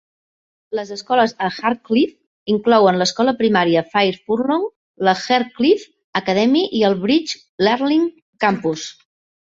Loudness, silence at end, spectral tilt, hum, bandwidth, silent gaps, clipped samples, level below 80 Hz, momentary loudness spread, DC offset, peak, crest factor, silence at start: -18 LUFS; 0.6 s; -5 dB/octave; none; 7.8 kHz; 2.26-2.46 s, 4.76-4.94 s, 6.04-6.13 s, 7.49-7.58 s, 8.22-8.33 s; under 0.1%; -60 dBFS; 10 LU; under 0.1%; 0 dBFS; 18 dB; 0.7 s